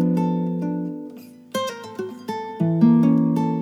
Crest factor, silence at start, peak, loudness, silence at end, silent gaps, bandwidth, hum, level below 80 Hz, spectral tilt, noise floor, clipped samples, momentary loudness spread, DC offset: 16 dB; 0 s; -4 dBFS; -22 LUFS; 0 s; none; 13.5 kHz; none; -78 dBFS; -8 dB/octave; -40 dBFS; under 0.1%; 16 LU; under 0.1%